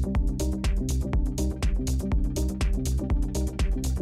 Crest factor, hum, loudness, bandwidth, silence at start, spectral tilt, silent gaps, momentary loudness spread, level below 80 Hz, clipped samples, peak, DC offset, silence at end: 8 dB; none; -28 LUFS; 15 kHz; 0 s; -6 dB/octave; none; 1 LU; -26 dBFS; under 0.1%; -16 dBFS; under 0.1%; 0 s